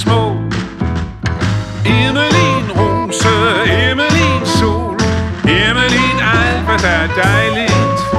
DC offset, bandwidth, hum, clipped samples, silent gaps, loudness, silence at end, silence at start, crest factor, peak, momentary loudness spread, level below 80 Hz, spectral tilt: under 0.1%; 13 kHz; none; under 0.1%; none; -13 LUFS; 0 s; 0 s; 12 dB; 0 dBFS; 7 LU; -28 dBFS; -5 dB/octave